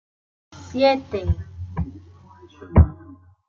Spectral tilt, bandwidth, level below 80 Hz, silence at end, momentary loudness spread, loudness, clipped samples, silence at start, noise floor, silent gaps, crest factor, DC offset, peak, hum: -8 dB/octave; 7 kHz; -32 dBFS; 0.35 s; 15 LU; -22 LUFS; under 0.1%; 0.55 s; -47 dBFS; none; 20 dB; under 0.1%; -2 dBFS; none